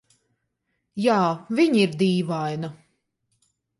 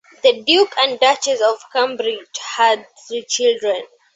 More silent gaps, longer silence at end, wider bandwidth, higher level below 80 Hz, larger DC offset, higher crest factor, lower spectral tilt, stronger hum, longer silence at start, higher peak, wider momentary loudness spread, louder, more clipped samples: neither; first, 1.05 s vs 0.3 s; first, 11.5 kHz vs 8.4 kHz; about the same, -70 dBFS vs -70 dBFS; neither; about the same, 18 dB vs 16 dB; first, -6.5 dB/octave vs -0.5 dB/octave; neither; first, 0.95 s vs 0.25 s; second, -6 dBFS vs -2 dBFS; about the same, 13 LU vs 12 LU; second, -22 LUFS vs -17 LUFS; neither